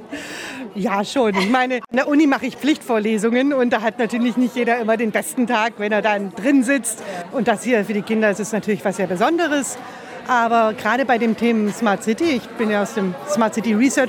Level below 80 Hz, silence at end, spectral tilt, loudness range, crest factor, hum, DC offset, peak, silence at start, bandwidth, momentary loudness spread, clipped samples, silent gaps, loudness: -66 dBFS; 0 s; -4.5 dB/octave; 1 LU; 14 dB; none; under 0.1%; -4 dBFS; 0 s; 17.5 kHz; 6 LU; under 0.1%; none; -19 LUFS